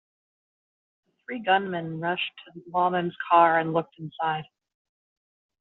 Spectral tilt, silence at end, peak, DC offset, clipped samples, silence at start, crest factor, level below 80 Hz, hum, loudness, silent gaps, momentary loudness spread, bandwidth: -3 dB/octave; 1.2 s; -6 dBFS; under 0.1%; under 0.1%; 1.3 s; 22 dB; -74 dBFS; none; -25 LUFS; none; 14 LU; 4.1 kHz